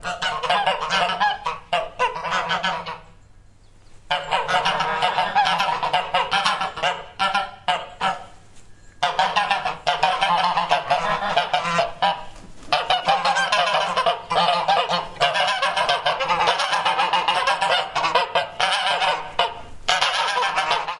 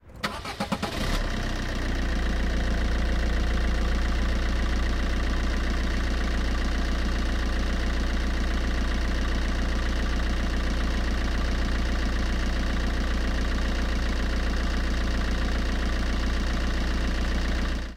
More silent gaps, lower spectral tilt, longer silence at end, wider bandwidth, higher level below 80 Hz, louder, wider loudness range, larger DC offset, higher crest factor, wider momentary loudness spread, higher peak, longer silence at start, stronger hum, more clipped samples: neither; second, -2 dB/octave vs -5.5 dB/octave; about the same, 0 s vs 0 s; about the same, 12 kHz vs 12.5 kHz; second, -50 dBFS vs -26 dBFS; first, -21 LUFS vs -28 LUFS; first, 4 LU vs 1 LU; neither; first, 22 dB vs 12 dB; first, 6 LU vs 1 LU; first, 0 dBFS vs -12 dBFS; about the same, 0 s vs 0.05 s; neither; neither